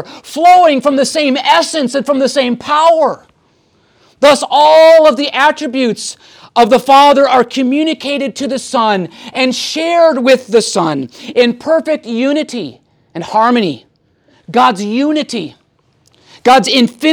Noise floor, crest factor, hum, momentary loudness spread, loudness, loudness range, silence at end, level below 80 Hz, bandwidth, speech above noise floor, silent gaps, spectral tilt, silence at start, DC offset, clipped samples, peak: -54 dBFS; 12 dB; none; 13 LU; -11 LUFS; 6 LU; 0 s; -60 dBFS; 19 kHz; 44 dB; none; -3.5 dB/octave; 0 s; under 0.1%; under 0.1%; 0 dBFS